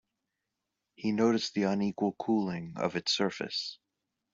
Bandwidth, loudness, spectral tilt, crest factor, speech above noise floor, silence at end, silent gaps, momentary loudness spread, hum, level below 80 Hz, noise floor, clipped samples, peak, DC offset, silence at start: 7.6 kHz; -31 LUFS; -5 dB/octave; 20 dB; 55 dB; 0.6 s; none; 8 LU; none; -72 dBFS; -86 dBFS; under 0.1%; -14 dBFS; under 0.1%; 1 s